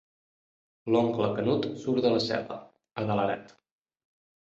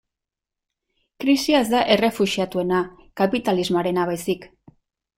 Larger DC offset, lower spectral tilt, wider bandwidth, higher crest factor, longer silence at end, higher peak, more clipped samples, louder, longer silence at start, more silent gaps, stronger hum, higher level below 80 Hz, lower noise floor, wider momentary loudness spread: neither; first, -7 dB/octave vs -5 dB/octave; second, 8 kHz vs 16 kHz; about the same, 20 dB vs 20 dB; first, 0.95 s vs 0.7 s; second, -10 dBFS vs -2 dBFS; neither; second, -28 LUFS vs -21 LUFS; second, 0.85 s vs 1.2 s; neither; neither; second, -66 dBFS vs -56 dBFS; first, under -90 dBFS vs -86 dBFS; first, 16 LU vs 9 LU